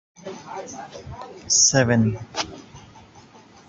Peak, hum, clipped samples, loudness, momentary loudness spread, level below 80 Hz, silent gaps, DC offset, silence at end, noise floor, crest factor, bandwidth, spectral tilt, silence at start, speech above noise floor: -4 dBFS; none; under 0.1%; -19 LUFS; 23 LU; -54 dBFS; none; under 0.1%; 0.5 s; -48 dBFS; 20 dB; 7.8 kHz; -3 dB/octave; 0.25 s; 26 dB